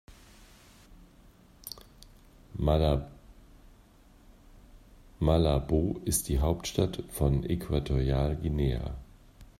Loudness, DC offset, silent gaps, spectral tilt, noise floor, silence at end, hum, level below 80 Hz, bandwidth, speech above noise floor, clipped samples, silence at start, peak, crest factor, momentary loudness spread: -29 LUFS; under 0.1%; none; -6 dB/octave; -57 dBFS; 0.15 s; none; -38 dBFS; 16 kHz; 30 dB; under 0.1%; 0.1 s; -10 dBFS; 20 dB; 18 LU